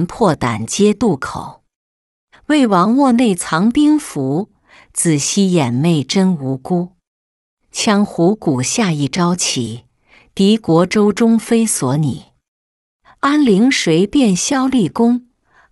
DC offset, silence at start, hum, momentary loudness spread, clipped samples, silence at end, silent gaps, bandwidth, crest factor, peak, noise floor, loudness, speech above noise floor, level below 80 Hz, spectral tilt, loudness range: under 0.1%; 0 s; none; 9 LU; under 0.1%; 0.5 s; 1.75-2.27 s, 7.07-7.57 s, 12.48-13.00 s; 12 kHz; 14 dB; -2 dBFS; -51 dBFS; -15 LUFS; 37 dB; -50 dBFS; -5 dB/octave; 2 LU